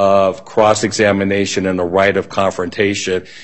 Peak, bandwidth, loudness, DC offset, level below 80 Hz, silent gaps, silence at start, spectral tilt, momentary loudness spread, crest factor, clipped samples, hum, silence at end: 0 dBFS; 8.6 kHz; -15 LUFS; 0.7%; -52 dBFS; none; 0 s; -4.5 dB/octave; 5 LU; 14 dB; under 0.1%; none; 0 s